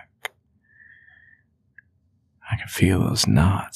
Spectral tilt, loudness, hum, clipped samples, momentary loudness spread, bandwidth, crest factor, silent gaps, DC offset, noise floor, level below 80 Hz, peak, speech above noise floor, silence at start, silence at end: -5 dB/octave; -21 LUFS; none; under 0.1%; 18 LU; 15 kHz; 22 dB; none; under 0.1%; -65 dBFS; -42 dBFS; -2 dBFS; 45 dB; 2.45 s; 0.05 s